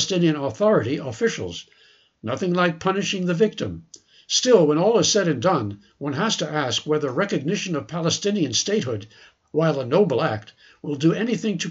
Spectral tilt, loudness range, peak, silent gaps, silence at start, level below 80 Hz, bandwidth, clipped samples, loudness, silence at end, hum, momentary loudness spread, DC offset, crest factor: -4.5 dB/octave; 3 LU; -4 dBFS; none; 0 s; -62 dBFS; 8 kHz; under 0.1%; -22 LUFS; 0 s; none; 13 LU; under 0.1%; 18 dB